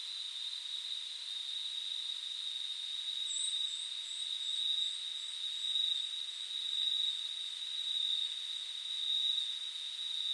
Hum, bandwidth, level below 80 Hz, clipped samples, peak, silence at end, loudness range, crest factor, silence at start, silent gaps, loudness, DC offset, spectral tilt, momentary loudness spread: none; 12.5 kHz; under -90 dBFS; under 0.1%; -22 dBFS; 0 s; 3 LU; 16 dB; 0 s; none; -35 LUFS; under 0.1%; 5.5 dB/octave; 7 LU